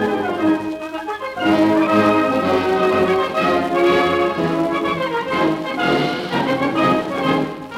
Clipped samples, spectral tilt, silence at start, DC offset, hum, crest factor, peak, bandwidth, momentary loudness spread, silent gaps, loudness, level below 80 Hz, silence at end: under 0.1%; -6 dB/octave; 0 s; under 0.1%; none; 14 dB; -4 dBFS; 15.5 kHz; 6 LU; none; -18 LUFS; -52 dBFS; 0 s